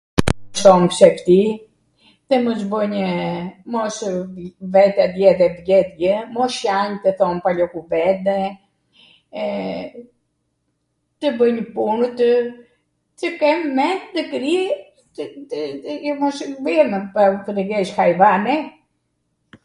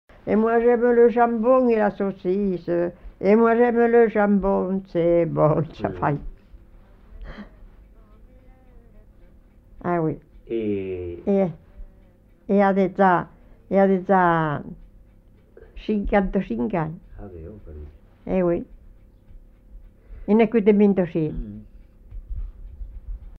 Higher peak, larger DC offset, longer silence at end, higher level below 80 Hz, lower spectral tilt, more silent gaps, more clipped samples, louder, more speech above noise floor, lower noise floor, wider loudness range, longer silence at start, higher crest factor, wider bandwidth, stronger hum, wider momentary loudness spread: first, 0 dBFS vs -4 dBFS; neither; first, 0.95 s vs 0.1 s; about the same, -46 dBFS vs -42 dBFS; second, -5.5 dB/octave vs -10 dB/octave; neither; neither; first, -18 LUFS vs -21 LUFS; first, 53 dB vs 32 dB; first, -70 dBFS vs -52 dBFS; second, 6 LU vs 11 LU; about the same, 0.15 s vs 0.25 s; about the same, 18 dB vs 18 dB; first, 11.5 kHz vs 5.6 kHz; neither; second, 14 LU vs 23 LU